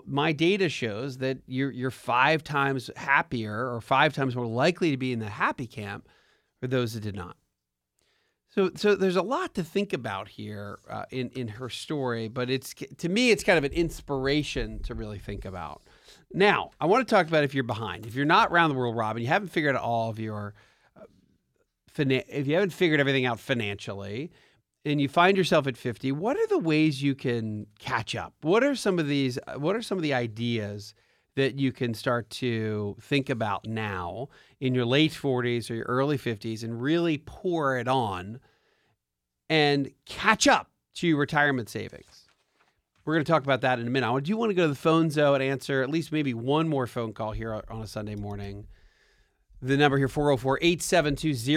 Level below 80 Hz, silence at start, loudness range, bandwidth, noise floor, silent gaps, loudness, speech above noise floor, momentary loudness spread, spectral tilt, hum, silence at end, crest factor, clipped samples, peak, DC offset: -52 dBFS; 0.05 s; 5 LU; 16 kHz; -84 dBFS; none; -27 LUFS; 58 dB; 14 LU; -5.5 dB/octave; none; 0 s; 24 dB; under 0.1%; -4 dBFS; under 0.1%